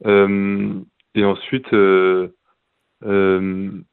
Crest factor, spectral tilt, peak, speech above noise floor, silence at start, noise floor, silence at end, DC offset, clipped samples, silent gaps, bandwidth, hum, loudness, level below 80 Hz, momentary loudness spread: 16 dB; -11 dB/octave; 0 dBFS; 52 dB; 0.05 s; -68 dBFS; 0.1 s; under 0.1%; under 0.1%; none; 4.2 kHz; none; -18 LUFS; -60 dBFS; 13 LU